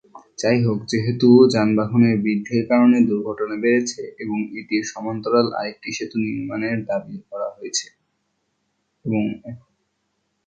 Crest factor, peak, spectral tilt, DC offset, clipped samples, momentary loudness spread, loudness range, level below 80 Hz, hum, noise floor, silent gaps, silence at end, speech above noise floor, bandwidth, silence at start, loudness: 20 dB; -2 dBFS; -6 dB/octave; under 0.1%; under 0.1%; 14 LU; 11 LU; -58 dBFS; none; -72 dBFS; none; 0.9 s; 53 dB; 8.8 kHz; 0.15 s; -20 LUFS